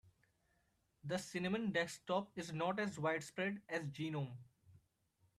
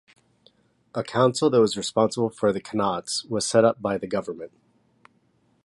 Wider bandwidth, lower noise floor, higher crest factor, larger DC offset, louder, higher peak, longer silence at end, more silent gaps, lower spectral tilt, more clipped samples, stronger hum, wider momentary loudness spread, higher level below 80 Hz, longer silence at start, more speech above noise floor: first, 14 kHz vs 11.5 kHz; first, -80 dBFS vs -65 dBFS; about the same, 20 dB vs 20 dB; neither; second, -41 LUFS vs -23 LUFS; second, -24 dBFS vs -4 dBFS; second, 0.6 s vs 1.2 s; neither; about the same, -5.5 dB/octave vs -4.5 dB/octave; neither; neither; second, 7 LU vs 13 LU; second, -80 dBFS vs -62 dBFS; second, 0.05 s vs 0.95 s; about the same, 39 dB vs 42 dB